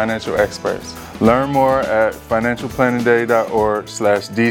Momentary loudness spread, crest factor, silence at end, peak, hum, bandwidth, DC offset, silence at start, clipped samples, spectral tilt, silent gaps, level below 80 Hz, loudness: 6 LU; 16 dB; 0 s; 0 dBFS; none; 19 kHz; under 0.1%; 0 s; under 0.1%; -5.5 dB/octave; none; -42 dBFS; -17 LUFS